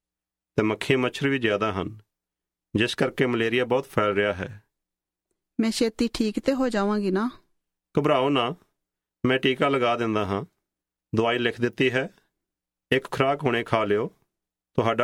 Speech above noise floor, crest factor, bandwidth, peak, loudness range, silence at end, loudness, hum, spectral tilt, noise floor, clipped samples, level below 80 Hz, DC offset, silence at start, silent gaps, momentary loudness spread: 65 dB; 20 dB; 15.5 kHz; -6 dBFS; 2 LU; 0 s; -25 LUFS; none; -5.5 dB/octave; -89 dBFS; under 0.1%; -56 dBFS; under 0.1%; 0.55 s; none; 9 LU